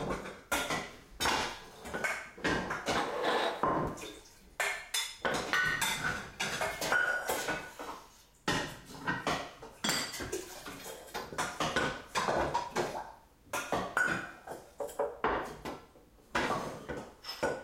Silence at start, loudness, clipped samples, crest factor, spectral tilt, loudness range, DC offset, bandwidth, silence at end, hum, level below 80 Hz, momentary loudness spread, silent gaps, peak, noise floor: 0 s; -34 LUFS; under 0.1%; 24 dB; -2.5 dB/octave; 4 LU; under 0.1%; 16.5 kHz; 0 s; none; -56 dBFS; 13 LU; none; -12 dBFS; -59 dBFS